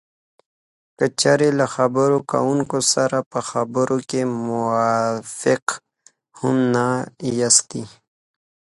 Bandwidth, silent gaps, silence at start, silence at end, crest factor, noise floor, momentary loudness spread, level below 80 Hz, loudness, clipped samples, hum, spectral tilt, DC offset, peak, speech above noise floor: 11.5 kHz; 3.26-3.31 s, 5.62-5.67 s; 1 s; 0.85 s; 20 dB; -56 dBFS; 9 LU; -62 dBFS; -19 LUFS; under 0.1%; none; -4 dB/octave; under 0.1%; -2 dBFS; 37 dB